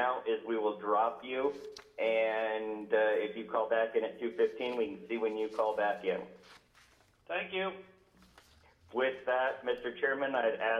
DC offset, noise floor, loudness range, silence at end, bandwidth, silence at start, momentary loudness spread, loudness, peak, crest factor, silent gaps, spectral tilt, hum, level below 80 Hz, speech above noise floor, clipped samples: under 0.1%; -65 dBFS; 5 LU; 0 s; 9 kHz; 0 s; 7 LU; -33 LUFS; -18 dBFS; 16 dB; none; -5 dB/octave; none; -74 dBFS; 32 dB; under 0.1%